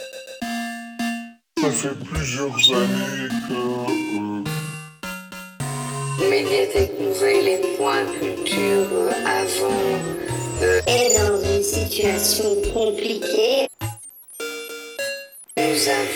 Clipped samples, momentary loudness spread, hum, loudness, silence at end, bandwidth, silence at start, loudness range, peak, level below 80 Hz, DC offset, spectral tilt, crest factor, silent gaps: under 0.1%; 14 LU; none; -21 LUFS; 0 s; over 20 kHz; 0 s; 5 LU; -2 dBFS; -42 dBFS; under 0.1%; -3.5 dB/octave; 20 dB; none